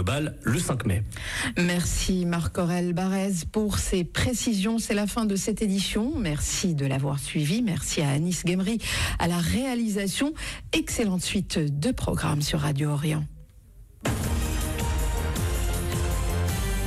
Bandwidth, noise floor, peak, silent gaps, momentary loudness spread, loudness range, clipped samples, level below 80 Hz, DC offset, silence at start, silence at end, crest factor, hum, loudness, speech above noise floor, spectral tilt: 16 kHz; -49 dBFS; -14 dBFS; none; 3 LU; 2 LU; under 0.1%; -34 dBFS; under 0.1%; 0 s; 0 s; 12 dB; none; -26 LUFS; 24 dB; -5 dB/octave